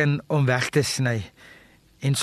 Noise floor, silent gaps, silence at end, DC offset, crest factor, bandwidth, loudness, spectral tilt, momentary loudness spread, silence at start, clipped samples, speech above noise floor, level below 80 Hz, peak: -48 dBFS; none; 0 s; under 0.1%; 16 dB; 13 kHz; -23 LUFS; -5 dB/octave; 9 LU; 0 s; under 0.1%; 25 dB; -58 dBFS; -8 dBFS